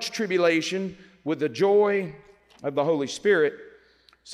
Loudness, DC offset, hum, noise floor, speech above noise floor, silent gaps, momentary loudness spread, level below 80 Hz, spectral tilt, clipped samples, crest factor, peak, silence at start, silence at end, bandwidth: -24 LUFS; under 0.1%; none; -59 dBFS; 35 dB; none; 13 LU; -70 dBFS; -4.5 dB/octave; under 0.1%; 16 dB; -10 dBFS; 0 s; 0 s; 12.5 kHz